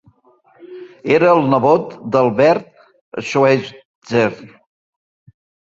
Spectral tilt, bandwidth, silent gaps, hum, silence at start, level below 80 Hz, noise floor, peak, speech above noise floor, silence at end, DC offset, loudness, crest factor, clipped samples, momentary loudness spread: -6.5 dB/octave; 7.8 kHz; 3.01-3.12 s, 3.85-4.02 s; none; 0.65 s; -60 dBFS; -53 dBFS; -2 dBFS; 39 dB; 1.2 s; under 0.1%; -15 LUFS; 16 dB; under 0.1%; 20 LU